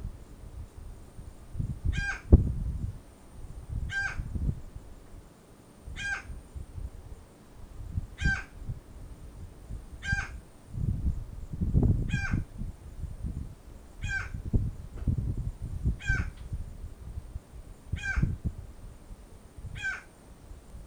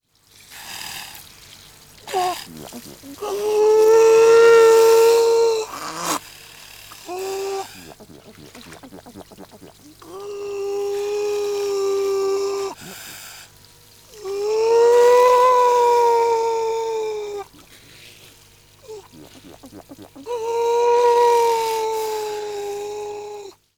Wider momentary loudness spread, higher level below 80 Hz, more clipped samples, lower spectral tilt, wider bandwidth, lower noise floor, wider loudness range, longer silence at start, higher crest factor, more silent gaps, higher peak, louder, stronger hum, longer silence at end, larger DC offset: second, 20 LU vs 25 LU; first, -36 dBFS vs -60 dBFS; neither; first, -6.5 dB/octave vs -2.5 dB/octave; second, 11.5 kHz vs 18 kHz; about the same, -54 dBFS vs -51 dBFS; second, 7 LU vs 19 LU; second, 0 s vs 0.5 s; first, 28 dB vs 16 dB; neither; about the same, -6 dBFS vs -4 dBFS; second, -33 LUFS vs -17 LUFS; second, none vs 50 Hz at -60 dBFS; second, 0 s vs 0.3 s; neither